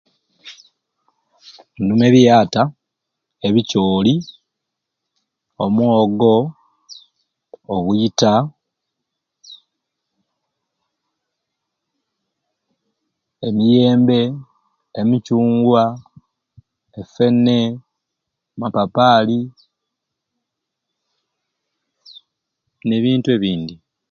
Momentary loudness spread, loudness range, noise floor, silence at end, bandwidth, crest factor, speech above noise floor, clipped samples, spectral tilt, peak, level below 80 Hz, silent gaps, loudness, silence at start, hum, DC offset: 15 LU; 7 LU; -79 dBFS; 0.35 s; 7 kHz; 18 dB; 65 dB; under 0.1%; -6.5 dB/octave; 0 dBFS; -56 dBFS; none; -16 LUFS; 0.45 s; none; under 0.1%